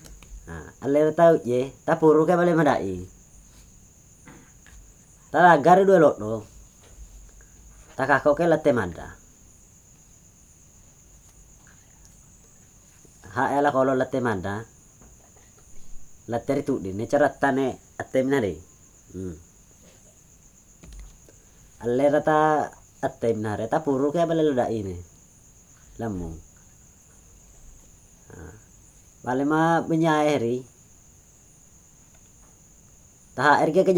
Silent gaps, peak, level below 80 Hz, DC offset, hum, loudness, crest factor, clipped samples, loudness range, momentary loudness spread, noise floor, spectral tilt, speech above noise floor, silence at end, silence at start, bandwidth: none; -4 dBFS; -52 dBFS; under 0.1%; none; -22 LUFS; 22 dB; under 0.1%; 14 LU; 22 LU; -53 dBFS; -6.5 dB/octave; 32 dB; 0 s; 0.05 s; 19.5 kHz